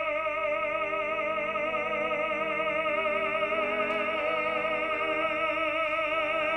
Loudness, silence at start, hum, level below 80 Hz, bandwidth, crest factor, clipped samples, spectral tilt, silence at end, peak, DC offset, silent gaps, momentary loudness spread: -28 LUFS; 0 s; 50 Hz at -65 dBFS; -60 dBFS; 9.6 kHz; 12 dB; under 0.1%; -4.5 dB/octave; 0 s; -16 dBFS; under 0.1%; none; 2 LU